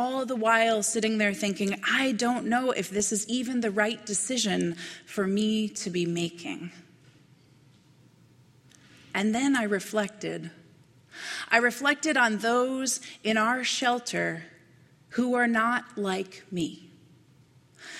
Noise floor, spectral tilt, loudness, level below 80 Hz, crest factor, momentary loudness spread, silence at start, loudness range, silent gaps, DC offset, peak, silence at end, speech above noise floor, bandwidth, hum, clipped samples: -59 dBFS; -3.5 dB/octave; -27 LUFS; -70 dBFS; 22 dB; 12 LU; 0 s; 7 LU; none; under 0.1%; -6 dBFS; 0 s; 31 dB; 15 kHz; none; under 0.1%